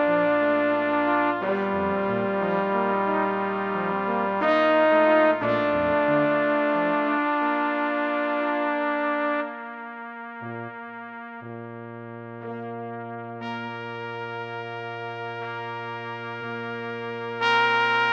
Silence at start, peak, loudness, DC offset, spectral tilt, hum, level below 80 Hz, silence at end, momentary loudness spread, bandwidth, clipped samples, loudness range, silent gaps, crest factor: 0 s; -8 dBFS; -24 LUFS; under 0.1%; -7 dB/octave; none; -64 dBFS; 0 s; 16 LU; 7 kHz; under 0.1%; 14 LU; none; 18 dB